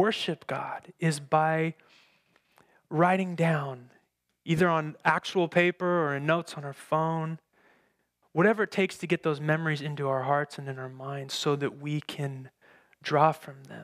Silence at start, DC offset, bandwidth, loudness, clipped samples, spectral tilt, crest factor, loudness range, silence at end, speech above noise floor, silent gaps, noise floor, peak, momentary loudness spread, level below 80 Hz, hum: 0 s; under 0.1%; 14.5 kHz; -28 LUFS; under 0.1%; -6 dB/octave; 22 dB; 4 LU; 0 s; 44 dB; none; -72 dBFS; -8 dBFS; 14 LU; -72 dBFS; none